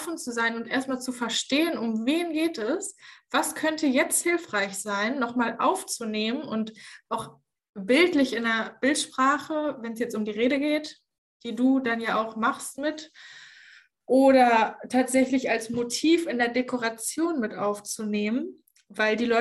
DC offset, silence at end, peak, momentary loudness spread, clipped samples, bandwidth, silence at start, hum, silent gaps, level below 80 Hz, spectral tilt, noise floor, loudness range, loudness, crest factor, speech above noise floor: under 0.1%; 0 s; -8 dBFS; 12 LU; under 0.1%; 13 kHz; 0 s; none; 7.69-7.73 s, 11.18-11.40 s; -70 dBFS; -3 dB/octave; -54 dBFS; 4 LU; -25 LUFS; 18 dB; 29 dB